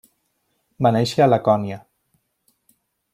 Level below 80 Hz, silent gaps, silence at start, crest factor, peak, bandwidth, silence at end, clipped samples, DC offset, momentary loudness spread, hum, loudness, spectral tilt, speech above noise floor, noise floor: -60 dBFS; none; 0.8 s; 20 dB; -4 dBFS; 15 kHz; 1.35 s; under 0.1%; under 0.1%; 13 LU; none; -19 LUFS; -6.5 dB/octave; 53 dB; -70 dBFS